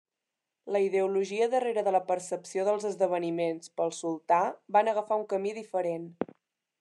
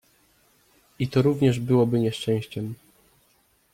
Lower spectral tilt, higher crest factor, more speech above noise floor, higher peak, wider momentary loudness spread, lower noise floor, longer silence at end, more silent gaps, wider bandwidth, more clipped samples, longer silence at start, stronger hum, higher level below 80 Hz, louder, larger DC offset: second, -5 dB/octave vs -7.5 dB/octave; about the same, 18 dB vs 16 dB; first, 59 dB vs 42 dB; second, -12 dBFS vs -8 dBFS; second, 7 LU vs 13 LU; first, -87 dBFS vs -64 dBFS; second, 0.55 s vs 1 s; neither; second, 11.5 kHz vs 16 kHz; neither; second, 0.65 s vs 1 s; neither; second, -88 dBFS vs -58 dBFS; second, -29 LUFS vs -24 LUFS; neither